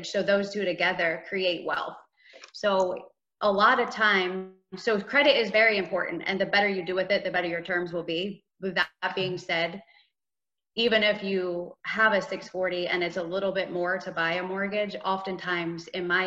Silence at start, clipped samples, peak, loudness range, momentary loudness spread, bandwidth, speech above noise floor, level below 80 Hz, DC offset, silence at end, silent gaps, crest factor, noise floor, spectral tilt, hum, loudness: 0 s; under 0.1%; -8 dBFS; 5 LU; 11 LU; 8 kHz; over 63 dB; -70 dBFS; under 0.1%; 0 s; none; 20 dB; under -90 dBFS; -4.5 dB/octave; none; -26 LUFS